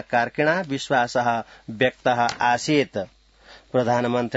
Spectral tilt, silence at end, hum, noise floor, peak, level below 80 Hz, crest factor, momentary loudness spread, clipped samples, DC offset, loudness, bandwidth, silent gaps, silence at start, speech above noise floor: -5 dB/octave; 0 s; none; -50 dBFS; -6 dBFS; -60 dBFS; 18 dB; 8 LU; under 0.1%; under 0.1%; -22 LUFS; 8 kHz; none; 0.1 s; 28 dB